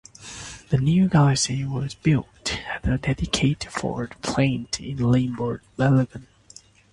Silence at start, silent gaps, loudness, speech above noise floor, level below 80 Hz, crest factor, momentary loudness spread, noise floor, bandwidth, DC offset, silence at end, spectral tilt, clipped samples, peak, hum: 0.2 s; none; -23 LUFS; 28 dB; -42 dBFS; 18 dB; 11 LU; -50 dBFS; 11.5 kHz; under 0.1%; 0.7 s; -5.5 dB/octave; under 0.1%; -6 dBFS; none